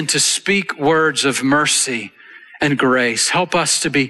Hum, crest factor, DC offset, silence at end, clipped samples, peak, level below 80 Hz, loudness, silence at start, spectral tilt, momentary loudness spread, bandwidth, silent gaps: none; 12 dB; under 0.1%; 0 s; under 0.1%; -4 dBFS; -56 dBFS; -16 LUFS; 0 s; -2.5 dB/octave; 6 LU; 12.5 kHz; none